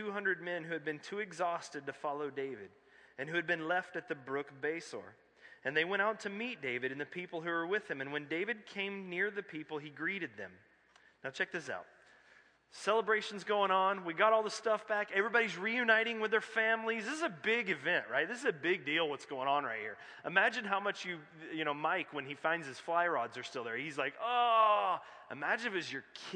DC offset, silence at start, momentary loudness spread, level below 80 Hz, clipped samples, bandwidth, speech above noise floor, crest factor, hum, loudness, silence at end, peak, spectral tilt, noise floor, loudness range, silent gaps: under 0.1%; 0 s; 13 LU; -88 dBFS; under 0.1%; 10 kHz; 31 dB; 22 dB; none; -35 LUFS; 0 s; -14 dBFS; -4 dB/octave; -67 dBFS; 8 LU; none